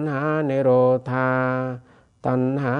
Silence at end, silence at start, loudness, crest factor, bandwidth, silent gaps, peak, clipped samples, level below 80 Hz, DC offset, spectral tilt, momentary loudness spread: 0 s; 0 s; -21 LUFS; 14 dB; 6.4 kHz; none; -8 dBFS; under 0.1%; -64 dBFS; under 0.1%; -9.5 dB/octave; 12 LU